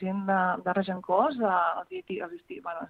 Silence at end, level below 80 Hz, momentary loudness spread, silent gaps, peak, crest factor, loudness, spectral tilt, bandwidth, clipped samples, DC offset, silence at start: 0 s; -70 dBFS; 12 LU; none; -10 dBFS; 18 dB; -28 LUFS; -9 dB/octave; 4.7 kHz; under 0.1%; under 0.1%; 0 s